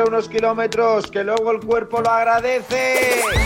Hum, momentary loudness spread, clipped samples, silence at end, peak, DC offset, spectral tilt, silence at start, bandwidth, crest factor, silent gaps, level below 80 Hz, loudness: none; 4 LU; under 0.1%; 0 s; -4 dBFS; under 0.1%; -4 dB/octave; 0 s; 17 kHz; 14 dB; none; -38 dBFS; -18 LUFS